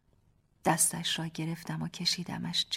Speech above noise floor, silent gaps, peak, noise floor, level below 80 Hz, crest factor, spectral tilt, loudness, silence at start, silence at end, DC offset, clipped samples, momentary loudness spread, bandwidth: 36 dB; none; -12 dBFS; -68 dBFS; -66 dBFS; 20 dB; -2.5 dB/octave; -31 LUFS; 0.65 s; 0 s; under 0.1%; under 0.1%; 11 LU; 16 kHz